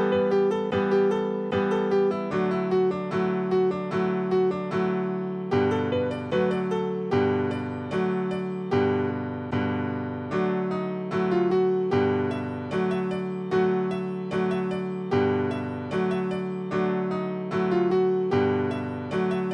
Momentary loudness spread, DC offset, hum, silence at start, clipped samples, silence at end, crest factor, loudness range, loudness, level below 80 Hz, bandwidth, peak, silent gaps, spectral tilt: 6 LU; under 0.1%; none; 0 s; under 0.1%; 0 s; 14 dB; 2 LU; -26 LUFS; -62 dBFS; 8.2 kHz; -12 dBFS; none; -8 dB/octave